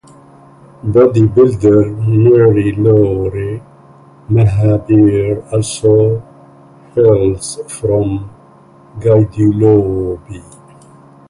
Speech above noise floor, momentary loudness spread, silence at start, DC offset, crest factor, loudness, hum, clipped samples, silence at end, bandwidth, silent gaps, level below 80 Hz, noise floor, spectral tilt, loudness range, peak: 31 dB; 13 LU; 0.85 s; under 0.1%; 12 dB; -12 LUFS; none; under 0.1%; 0.9 s; 11.5 kHz; none; -36 dBFS; -42 dBFS; -8 dB/octave; 4 LU; 0 dBFS